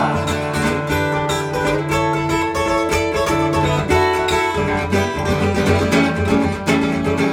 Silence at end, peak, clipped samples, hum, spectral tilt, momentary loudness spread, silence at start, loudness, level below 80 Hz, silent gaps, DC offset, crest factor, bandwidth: 0 s; -2 dBFS; under 0.1%; none; -5.5 dB/octave; 3 LU; 0 s; -18 LUFS; -38 dBFS; none; under 0.1%; 16 dB; over 20 kHz